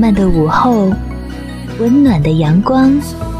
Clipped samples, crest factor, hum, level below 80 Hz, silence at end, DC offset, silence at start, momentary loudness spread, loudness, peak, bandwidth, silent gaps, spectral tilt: under 0.1%; 12 dB; none; -26 dBFS; 0 s; under 0.1%; 0 s; 15 LU; -11 LUFS; 0 dBFS; 14.5 kHz; none; -8 dB/octave